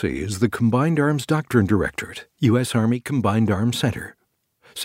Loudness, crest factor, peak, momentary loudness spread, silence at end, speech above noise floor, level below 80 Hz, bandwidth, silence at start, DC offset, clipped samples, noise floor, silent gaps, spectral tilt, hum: -21 LUFS; 18 dB; -4 dBFS; 12 LU; 0 s; 43 dB; -48 dBFS; 16 kHz; 0 s; under 0.1%; under 0.1%; -64 dBFS; none; -6.5 dB/octave; none